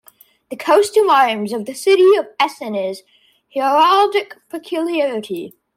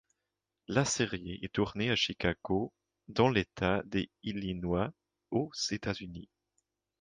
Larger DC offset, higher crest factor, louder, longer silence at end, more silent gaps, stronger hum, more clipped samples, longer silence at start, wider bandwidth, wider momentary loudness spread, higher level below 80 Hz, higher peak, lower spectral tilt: neither; second, 14 dB vs 22 dB; first, -16 LUFS vs -33 LUFS; second, 0.25 s vs 0.8 s; neither; neither; neither; second, 0.5 s vs 0.7 s; first, 16 kHz vs 9.8 kHz; first, 16 LU vs 10 LU; second, -70 dBFS vs -54 dBFS; first, -4 dBFS vs -12 dBFS; about the same, -3.5 dB/octave vs -4.5 dB/octave